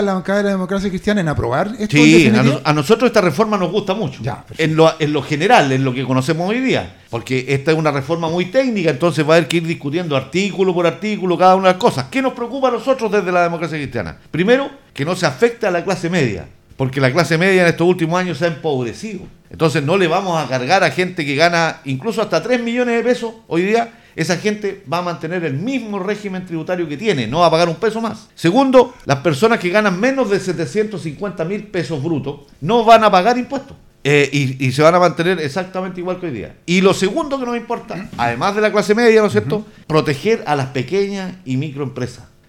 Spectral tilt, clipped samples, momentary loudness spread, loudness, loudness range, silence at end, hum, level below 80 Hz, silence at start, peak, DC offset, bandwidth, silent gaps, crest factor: -5.5 dB/octave; under 0.1%; 12 LU; -16 LUFS; 5 LU; 0.25 s; none; -48 dBFS; 0 s; 0 dBFS; under 0.1%; 16.5 kHz; none; 16 dB